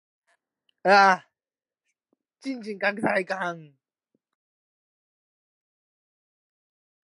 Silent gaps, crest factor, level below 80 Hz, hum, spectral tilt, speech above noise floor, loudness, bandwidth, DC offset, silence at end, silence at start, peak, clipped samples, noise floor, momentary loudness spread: none; 24 dB; -76 dBFS; none; -4.5 dB/octave; over 67 dB; -23 LUFS; 11.5 kHz; under 0.1%; 3.45 s; 0.85 s; -4 dBFS; under 0.1%; under -90 dBFS; 18 LU